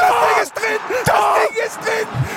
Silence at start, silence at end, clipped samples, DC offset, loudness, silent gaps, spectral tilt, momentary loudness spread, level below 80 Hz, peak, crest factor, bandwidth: 0 s; 0 s; under 0.1%; under 0.1%; -17 LUFS; none; -4 dB/octave; 6 LU; -46 dBFS; -2 dBFS; 14 dB; 17 kHz